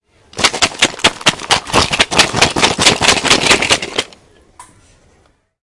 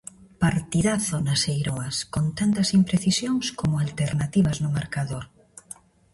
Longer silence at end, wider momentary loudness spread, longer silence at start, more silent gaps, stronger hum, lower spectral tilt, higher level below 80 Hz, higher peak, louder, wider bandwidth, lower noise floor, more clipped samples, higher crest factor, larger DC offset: first, 1 s vs 0.4 s; second, 6 LU vs 18 LU; about the same, 0.35 s vs 0.4 s; neither; neither; second, -1.5 dB/octave vs -5 dB/octave; first, -38 dBFS vs -48 dBFS; first, 0 dBFS vs -8 dBFS; first, -11 LUFS vs -24 LUFS; about the same, 12 kHz vs 11.5 kHz; first, -54 dBFS vs -47 dBFS; first, 0.3% vs under 0.1%; about the same, 14 dB vs 16 dB; neither